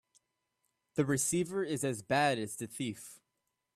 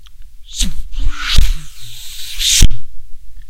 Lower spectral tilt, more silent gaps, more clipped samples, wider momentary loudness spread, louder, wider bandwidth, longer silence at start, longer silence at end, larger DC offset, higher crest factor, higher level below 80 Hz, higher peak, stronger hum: first, -4 dB/octave vs -1.5 dB/octave; neither; second, under 0.1% vs 3%; second, 10 LU vs 19 LU; second, -33 LUFS vs -16 LUFS; about the same, 15 kHz vs 16 kHz; first, 0.95 s vs 0 s; first, 0.6 s vs 0 s; neither; first, 20 dB vs 10 dB; second, -72 dBFS vs -16 dBFS; second, -16 dBFS vs 0 dBFS; neither